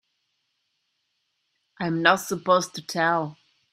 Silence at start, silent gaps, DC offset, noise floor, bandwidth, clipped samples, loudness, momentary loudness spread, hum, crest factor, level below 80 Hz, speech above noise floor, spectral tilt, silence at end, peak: 1.8 s; none; under 0.1%; -75 dBFS; 16 kHz; under 0.1%; -23 LUFS; 10 LU; none; 26 dB; -72 dBFS; 52 dB; -4 dB/octave; 0.4 s; -2 dBFS